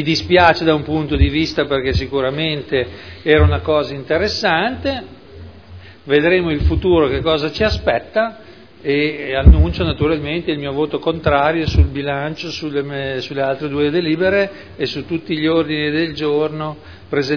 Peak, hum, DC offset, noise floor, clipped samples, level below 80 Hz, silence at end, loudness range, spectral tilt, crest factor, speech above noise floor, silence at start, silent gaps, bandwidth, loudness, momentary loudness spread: 0 dBFS; none; 0.4%; -39 dBFS; under 0.1%; -24 dBFS; 0 s; 3 LU; -7 dB/octave; 16 dB; 22 dB; 0 s; none; 5.4 kHz; -17 LUFS; 10 LU